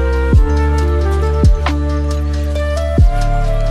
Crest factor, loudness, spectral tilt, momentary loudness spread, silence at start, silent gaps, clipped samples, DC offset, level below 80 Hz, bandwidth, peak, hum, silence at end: 12 dB; -15 LUFS; -7.5 dB/octave; 5 LU; 0 s; none; under 0.1%; under 0.1%; -14 dBFS; 10.5 kHz; 0 dBFS; none; 0 s